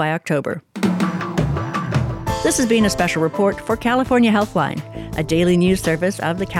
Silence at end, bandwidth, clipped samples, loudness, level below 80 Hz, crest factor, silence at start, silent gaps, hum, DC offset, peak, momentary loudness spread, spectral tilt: 0 s; 16.5 kHz; under 0.1%; -19 LUFS; -38 dBFS; 16 dB; 0 s; none; none; under 0.1%; -4 dBFS; 7 LU; -5.5 dB/octave